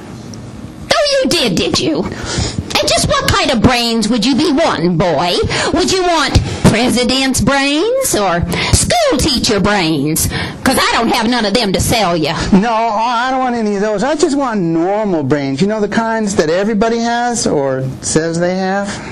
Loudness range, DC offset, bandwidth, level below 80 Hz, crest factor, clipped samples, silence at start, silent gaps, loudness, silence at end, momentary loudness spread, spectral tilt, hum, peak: 2 LU; under 0.1%; 15 kHz; -30 dBFS; 12 dB; under 0.1%; 0 s; none; -13 LUFS; 0 s; 4 LU; -4 dB/octave; none; 0 dBFS